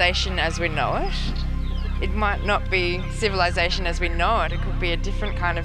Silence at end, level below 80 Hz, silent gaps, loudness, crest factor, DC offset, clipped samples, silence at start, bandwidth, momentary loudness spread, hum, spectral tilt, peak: 0 s; -26 dBFS; none; -24 LUFS; 18 dB; under 0.1%; under 0.1%; 0 s; 10 kHz; 7 LU; none; -5 dB/octave; -4 dBFS